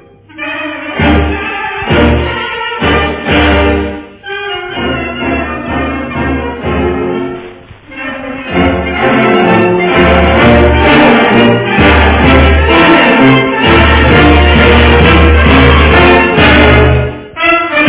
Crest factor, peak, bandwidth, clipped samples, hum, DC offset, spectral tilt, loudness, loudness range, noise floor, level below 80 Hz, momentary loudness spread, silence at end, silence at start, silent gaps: 8 dB; 0 dBFS; 4 kHz; 2%; none; under 0.1%; -10 dB/octave; -7 LUFS; 10 LU; -30 dBFS; -16 dBFS; 13 LU; 0 s; 0.35 s; none